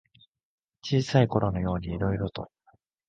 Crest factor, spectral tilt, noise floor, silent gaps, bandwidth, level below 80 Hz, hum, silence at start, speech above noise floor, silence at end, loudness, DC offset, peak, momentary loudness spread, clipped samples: 22 dB; -7 dB/octave; -66 dBFS; none; 7.6 kHz; -46 dBFS; none; 0.85 s; 40 dB; 0.65 s; -27 LUFS; under 0.1%; -8 dBFS; 17 LU; under 0.1%